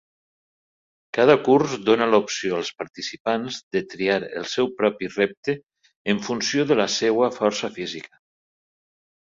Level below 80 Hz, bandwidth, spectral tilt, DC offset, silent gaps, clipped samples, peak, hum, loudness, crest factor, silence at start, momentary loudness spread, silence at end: -64 dBFS; 7.6 kHz; -4 dB/octave; under 0.1%; 3.20-3.25 s, 3.63-3.71 s, 5.37-5.43 s, 5.96-6.05 s; under 0.1%; -2 dBFS; none; -22 LUFS; 22 dB; 1.15 s; 13 LU; 1.3 s